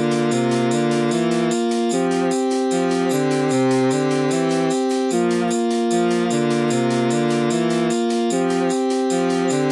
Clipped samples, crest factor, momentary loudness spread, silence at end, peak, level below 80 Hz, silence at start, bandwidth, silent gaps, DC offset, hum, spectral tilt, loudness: under 0.1%; 10 dB; 1 LU; 0 s; -8 dBFS; -70 dBFS; 0 s; 12 kHz; none; under 0.1%; none; -5 dB/octave; -19 LUFS